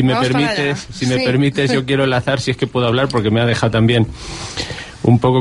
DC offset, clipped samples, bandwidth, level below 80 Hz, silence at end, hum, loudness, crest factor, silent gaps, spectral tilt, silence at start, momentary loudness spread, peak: under 0.1%; under 0.1%; 11.5 kHz; -40 dBFS; 0 s; none; -16 LUFS; 16 dB; none; -6 dB/octave; 0 s; 10 LU; 0 dBFS